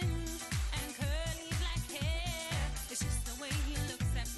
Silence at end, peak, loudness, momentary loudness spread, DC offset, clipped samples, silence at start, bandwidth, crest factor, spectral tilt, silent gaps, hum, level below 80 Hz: 0 s; -24 dBFS; -37 LUFS; 2 LU; under 0.1%; under 0.1%; 0 s; 12.5 kHz; 12 dB; -4 dB/octave; none; none; -40 dBFS